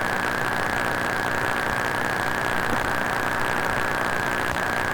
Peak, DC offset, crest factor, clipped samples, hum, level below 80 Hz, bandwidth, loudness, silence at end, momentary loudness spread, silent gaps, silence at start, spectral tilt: -8 dBFS; under 0.1%; 16 dB; under 0.1%; none; -46 dBFS; 19 kHz; -24 LUFS; 0 s; 0 LU; none; 0 s; -4 dB/octave